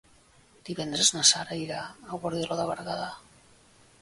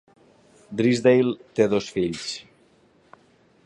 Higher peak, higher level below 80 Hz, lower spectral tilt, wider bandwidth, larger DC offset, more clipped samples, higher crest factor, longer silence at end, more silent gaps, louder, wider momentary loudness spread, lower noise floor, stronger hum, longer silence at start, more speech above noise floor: about the same, -6 dBFS vs -4 dBFS; about the same, -64 dBFS vs -60 dBFS; second, -1.5 dB/octave vs -5.5 dB/octave; about the same, 11.5 kHz vs 11 kHz; neither; neither; first, 26 dB vs 20 dB; second, 0.8 s vs 1.25 s; neither; second, -26 LUFS vs -22 LUFS; first, 19 LU vs 15 LU; about the same, -59 dBFS vs -59 dBFS; neither; about the same, 0.65 s vs 0.7 s; second, 30 dB vs 37 dB